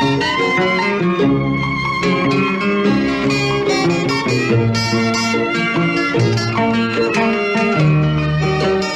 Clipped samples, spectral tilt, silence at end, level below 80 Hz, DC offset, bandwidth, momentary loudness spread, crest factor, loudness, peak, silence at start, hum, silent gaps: under 0.1%; -5.5 dB/octave; 0 s; -40 dBFS; under 0.1%; 12 kHz; 2 LU; 12 dB; -16 LUFS; -4 dBFS; 0 s; none; none